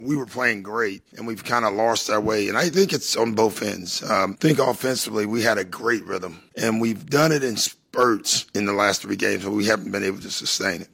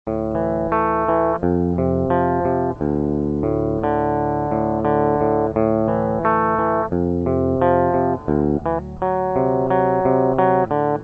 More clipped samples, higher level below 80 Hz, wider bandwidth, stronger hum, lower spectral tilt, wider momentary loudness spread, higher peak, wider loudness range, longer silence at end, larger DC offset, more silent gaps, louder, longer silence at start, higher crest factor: neither; second, -62 dBFS vs -38 dBFS; first, 16.5 kHz vs 5.6 kHz; neither; second, -3.5 dB/octave vs -10.5 dB/octave; first, 7 LU vs 4 LU; about the same, -4 dBFS vs -2 dBFS; about the same, 1 LU vs 1 LU; about the same, 0.1 s vs 0 s; neither; neither; second, -22 LUFS vs -19 LUFS; about the same, 0 s vs 0.05 s; about the same, 18 dB vs 16 dB